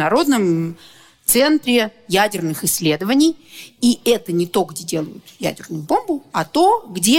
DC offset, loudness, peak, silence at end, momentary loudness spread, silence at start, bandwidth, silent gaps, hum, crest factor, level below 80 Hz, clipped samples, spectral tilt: under 0.1%; -18 LUFS; 0 dBFS; 0 s; 10 LU; 0 s; 17 kHz; none; none; 18 dB; -54 dBFS; under 0.1%; -4 dB/octave